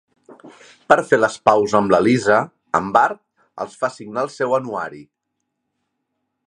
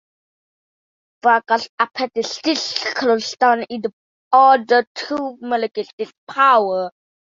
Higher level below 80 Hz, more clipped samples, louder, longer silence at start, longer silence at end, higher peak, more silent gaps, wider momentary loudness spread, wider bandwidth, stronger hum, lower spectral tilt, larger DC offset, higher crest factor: first, -58 dBFS vs -70 dBFS; neither; about the same, -18 LUFS vs -18 LUFS; second, 0.3 s vs 1.25 s; first, 1.45 s vs 0.5 s; about the same, 0 dBFS vs -2 dBFS; second, none vs 1.69-1.78 s, 3.93-4.31 s, 4.87-4.95 s, 5.93-5.98 s, 6.18-6.27 s; about the same, 13 LU vs 14 LU; first, 11 kHz vs 7.8 kHz; neither; first, -5.5 dB/octave vs -2.5 dB/octave; neither; about the same, 20 dB vs 18 dB